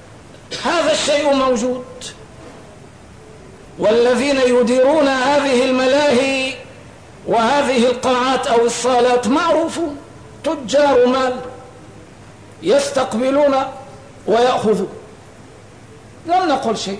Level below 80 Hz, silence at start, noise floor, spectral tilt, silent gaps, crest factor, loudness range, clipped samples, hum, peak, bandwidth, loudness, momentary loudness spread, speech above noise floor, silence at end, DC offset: -50 dBFS; 0.1 s; -40 dBFS; -4 dB/octave; none; 12 dB; 5 LU; under 0.1%; none; -6 dBFS; 11 kHz; -16 LUFS; 14 LU; 25 dB; 0 s; 0.3%